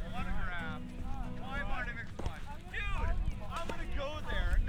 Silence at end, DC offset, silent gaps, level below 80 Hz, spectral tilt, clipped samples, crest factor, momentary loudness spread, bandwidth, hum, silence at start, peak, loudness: 0 s; under 0.1%; none; -36 dBFS; -6 dB/octave; under 0.1%; 16 dB; 6 LU; 10 kHz; none; 0 s; -18 dBFS; -40 LUFS